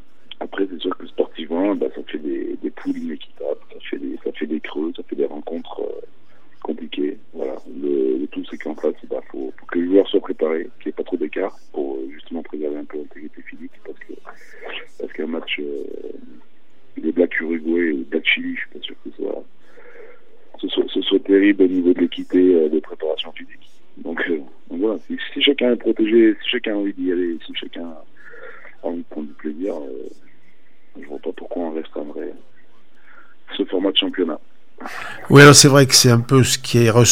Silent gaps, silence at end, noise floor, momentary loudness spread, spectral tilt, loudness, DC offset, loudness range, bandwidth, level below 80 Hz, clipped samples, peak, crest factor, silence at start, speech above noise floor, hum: none; 0 s; -58 dBFS; 19 LU; -4.5 dB/octave; -19 LUFS; 2%; 13 LU; 16.5 kHz; -58 dBFS; under 0.1%; 0 dBFS; 20 dB; 0.4 s; 39 dB; none